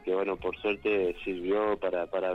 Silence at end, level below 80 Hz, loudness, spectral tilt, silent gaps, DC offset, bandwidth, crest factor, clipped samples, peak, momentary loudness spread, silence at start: 0 s; -56 dBFS; -30 LUFS; -7 dB/octave; none; under 0.1%; 5.8 kHz; 14 dB; under 0.1%; -16 dBFS; 4 LU; 0 s